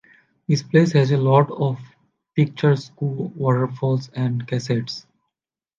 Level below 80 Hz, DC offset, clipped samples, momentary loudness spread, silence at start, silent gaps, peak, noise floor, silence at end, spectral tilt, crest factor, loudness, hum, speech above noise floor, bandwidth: -64 dBFS; under 0.1%; under 0.1%; 11 LU; 0.5 s; none; -4 dBFS; -86 dBFS; 0.8 s; -7.5 dB/octave; 18 dB; -21 LUFS; none; 67 dB; 7.4 kHz